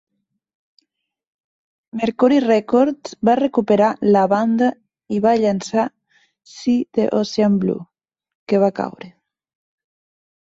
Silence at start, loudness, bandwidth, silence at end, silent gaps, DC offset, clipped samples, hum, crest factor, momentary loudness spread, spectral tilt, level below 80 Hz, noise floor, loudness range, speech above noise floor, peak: 1.95 s; -18 LUFS; 8 kHz; 1.4 s; 8.35-8.46 s; under 0.1%; under 0.1%; none; 16 dB; 10 LU; -6.5 dB/octave; -62 dBFS; -76 dBFS; 5 LU; 59 dB; -4 dBFS